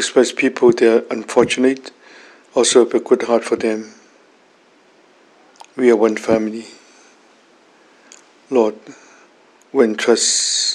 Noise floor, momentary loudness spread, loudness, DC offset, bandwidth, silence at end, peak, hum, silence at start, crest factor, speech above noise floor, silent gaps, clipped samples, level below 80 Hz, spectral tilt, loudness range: -52 dBFS; 14 LU; -16 LUFS; under 0.1%; 12 kHz; 0 s; 0 dBFS; none; 0 s; 18 dB; 37 dB; none; under 0.1%; -62 dBFS; -2.5 dB/octave; 7 LU